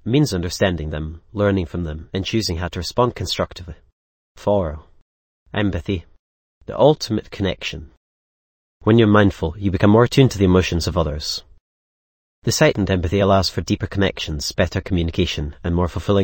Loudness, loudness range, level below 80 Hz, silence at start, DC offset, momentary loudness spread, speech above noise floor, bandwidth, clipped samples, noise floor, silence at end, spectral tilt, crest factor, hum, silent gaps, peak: -20 LUFS; 7 LU; -36 dBFS; 0.05 s; under 0.1%; 13 LU; over 71 dB; 17 kHz; under 0.1%; under -90 dBFS; 0 s; -6 dB/octave; 18 dB; none; 3.92-4.35 s, 5.02-5.46 s, 6.19-6.61 s, 7.97-8.80 s, 11.61-12.42 s; 0 dBFS